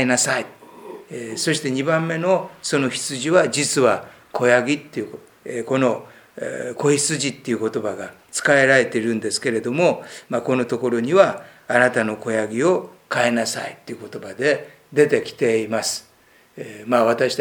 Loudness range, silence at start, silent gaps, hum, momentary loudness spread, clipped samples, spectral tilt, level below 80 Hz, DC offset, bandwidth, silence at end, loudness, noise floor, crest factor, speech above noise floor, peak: 3 LU; 0 s; none; none; 15 LU; under 0.1%; -4 dB/octave; -68 dBFS; under 0.1%; over 20 kHz; 0 s; -20 LUFS; -54 dBFS; 20 dB; 34 dB; 0 dBFS